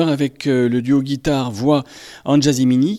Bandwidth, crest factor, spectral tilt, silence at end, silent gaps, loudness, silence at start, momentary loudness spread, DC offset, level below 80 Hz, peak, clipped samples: 13.5 kHz; 14 dB; -6 dB/octave; 0 s; none; -17 LUFS; 0 s; 5 LU; under 0.1%; -46 dBFS; -4 dBFS; under 0.1%